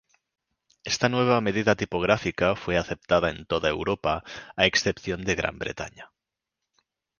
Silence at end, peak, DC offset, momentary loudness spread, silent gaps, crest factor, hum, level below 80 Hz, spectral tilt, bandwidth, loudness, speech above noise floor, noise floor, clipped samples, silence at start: 1.15 s; -2 dBFS; under 0.1%; 11 LU; none; 26 dB; none; -48 dBFS; -4.5 dB/octave; 10 kHz; -25 LUFS; 60 dB; -85 dBFS; under 0.1%; 0.85 s